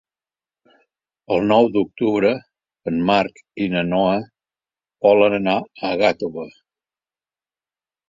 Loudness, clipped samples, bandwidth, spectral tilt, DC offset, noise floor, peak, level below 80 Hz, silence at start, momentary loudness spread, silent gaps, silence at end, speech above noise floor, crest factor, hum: -19 LUFS; under 0.1%; 7.6 kHz; -7 dB/octave; under 0.1%; under -90 dBFS; -2 dBFS; -56 dBFS; 1.3 s; 12 LU; none; 1.6 s; over 72 dB; 20 dB; none